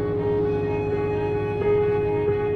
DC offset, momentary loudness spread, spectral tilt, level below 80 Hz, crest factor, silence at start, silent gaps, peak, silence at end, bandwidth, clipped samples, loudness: under 0.1%; 3 LU; -9.5 dB/octave; -42 dBFS; 10 dB; 0 s; none; -12 dBFS; 0 s; 4.6 kHz; under 0.1%; -23 LUFS